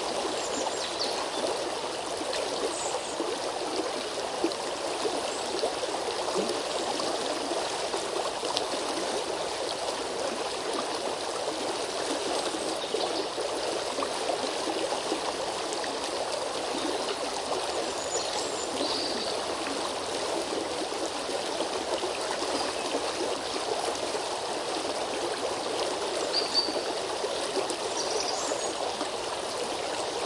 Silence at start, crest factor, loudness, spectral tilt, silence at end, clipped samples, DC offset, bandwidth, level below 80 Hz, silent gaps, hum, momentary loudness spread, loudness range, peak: 0 s; 24 dB; -30 LUFS; -1.5 dB/octave; 0 s; under 0.1%; under 0.1%; 12 kHz; -64 dBFS; none; none; 2 LU; 2 LU; -6 dBFS